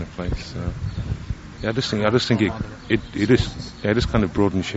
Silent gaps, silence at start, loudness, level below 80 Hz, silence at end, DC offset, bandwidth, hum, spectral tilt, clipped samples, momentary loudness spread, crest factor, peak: none; 0 s; -23 LUFS; -34 dBFS; 0 s; under 0.1%; 8 kHz; none; -5.5 dB/octave; under 0.1%; 11 LU; 20 dB; -2 dBFS